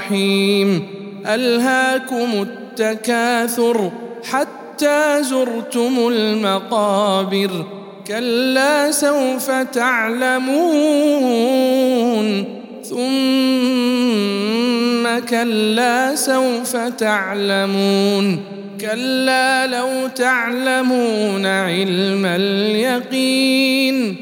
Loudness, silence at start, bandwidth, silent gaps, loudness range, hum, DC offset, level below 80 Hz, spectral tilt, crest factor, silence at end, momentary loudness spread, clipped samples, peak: -17 LUFS; 0 s; 17.5 kHz; none; 2 LU; none; under 0.1%; -76 dBFS; -4 dB/octave; 16 dB; 0 s; 7 LU; under 0.1%; -2 dBFS